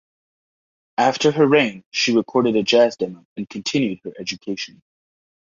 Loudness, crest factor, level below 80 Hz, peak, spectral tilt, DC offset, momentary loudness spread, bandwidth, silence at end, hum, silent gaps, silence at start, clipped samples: -19 LUFS; 18 dB; -64 dBFS; -2 dBFS; -4.5 dB/octave; under 0.1%; 14 LU; 7.4 kHz; 0.95 s; none; 1.86-1.91 s, 3.25-3.36 s; 1 s; under 0.1%